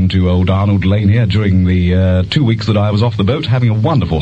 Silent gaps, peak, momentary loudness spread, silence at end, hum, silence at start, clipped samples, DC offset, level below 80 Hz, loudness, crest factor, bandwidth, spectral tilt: none; 0 dBFS; 2 LU; 0 s; none; 0 s; under 0.1%; under 0.1%; -32 dBFS; -13 LUFS; 10 dB; 7.6 kHz; -8.5 dB/octave